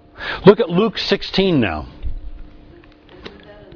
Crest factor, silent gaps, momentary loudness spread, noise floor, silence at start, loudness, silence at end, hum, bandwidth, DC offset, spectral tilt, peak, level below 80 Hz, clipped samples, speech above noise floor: 18 dB; none; 25 LU; -44 dBFS; 0.2 s; -16 LUFS; 0 s; none; 5.4 kHz; under 0.1%; -7 dB/octave; 0 dBFS; -34 dBFS; under 0.1%; 29 dB